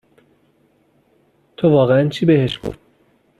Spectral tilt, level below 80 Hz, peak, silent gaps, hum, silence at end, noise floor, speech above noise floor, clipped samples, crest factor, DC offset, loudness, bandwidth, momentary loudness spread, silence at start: -8 dB/octave; -50 dBFS; -2 dBFS; none; none; 0.65 s; -59 dBFS; 44 dB; under 0.1%; 16 dB; under 0.1%; -16 LUFS; 11.5 kHz; 13 LU; 1.6 s